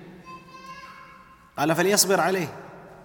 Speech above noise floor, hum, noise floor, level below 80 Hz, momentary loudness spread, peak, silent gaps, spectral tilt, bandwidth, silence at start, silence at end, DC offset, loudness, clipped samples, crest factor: 28 dB; none; -50 dBFS; -64 dBFS; 25 LU; -6 dBFS; none; -3 dB/octave; 19 kHz; 0 s; 0.1 s; under 0.1%; -22 LUFS; under 0.1%; 22 dB